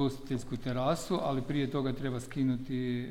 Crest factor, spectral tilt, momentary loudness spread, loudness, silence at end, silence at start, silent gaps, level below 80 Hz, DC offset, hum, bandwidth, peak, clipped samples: 14 dB; -6.5 dB/octave; 5 LU; -33 LUFS; 0 s; 0 s; none; -50 dBFS; 0.1%; none; 16 kHz; -18 dBFS; under 0.1%